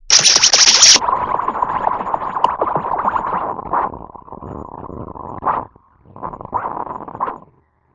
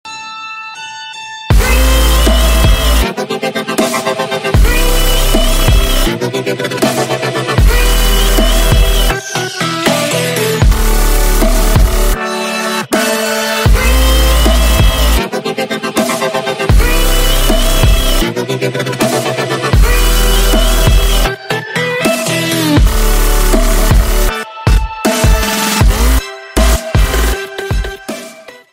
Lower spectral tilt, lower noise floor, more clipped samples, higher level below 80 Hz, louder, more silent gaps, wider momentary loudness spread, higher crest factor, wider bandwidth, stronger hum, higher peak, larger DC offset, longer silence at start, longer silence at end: second, 0 dB/octave vs -4 dB/octave; first, -55 dBFS vs -33 dBFS; first, 0.1% vs under 0.1%; second, -46 dBFS vs -12 dBFS; about the same, -13 LUFS vs -12 LUFS; neither; first, 24 LU vs 7 LU; first, 18 dB vs 10 dB; second, 12 kHz vs 16.5 kHz; neither; about the same, 0 dBFS vs 0 dBFS; neither; about the same, 0.05 s vs 0.05 s; first, 0.6 s vs 0.15 s